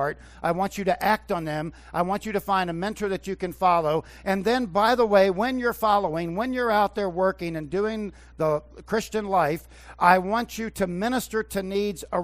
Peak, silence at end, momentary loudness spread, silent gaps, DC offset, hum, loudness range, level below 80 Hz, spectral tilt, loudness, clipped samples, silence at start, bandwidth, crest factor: -2 dBFS; 0 s; 10 LU; none; under 0.1%; none; 4 LU; -50 dBFS; -5.5 dB/octave; -25 LUFS; under 0.1%; 0 s; 16 kHz; 22 dB